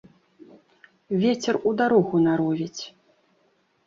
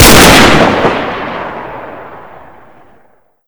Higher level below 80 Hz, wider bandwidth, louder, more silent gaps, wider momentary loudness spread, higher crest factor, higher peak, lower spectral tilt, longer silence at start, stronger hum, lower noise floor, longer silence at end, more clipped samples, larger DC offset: second, -66 dBFS vs -24 dBFS; second, 7.8 kHz vs over 20 kHz; second, -23 LUFS vs -6 LUFS; neither; second, 13 LU vs 24 LU; first, 18 dB vs 10 dB; second, -6 dBFS vs 0 dBFS; first, -6 dB/octave vs -3.5 dB/octave; first, 1.1 s vs 0 s; neither; first, -66 dBFS vs -49 dBFS; second, 1 s vs 1.25 s; second, under 0.1% vs 8%; neither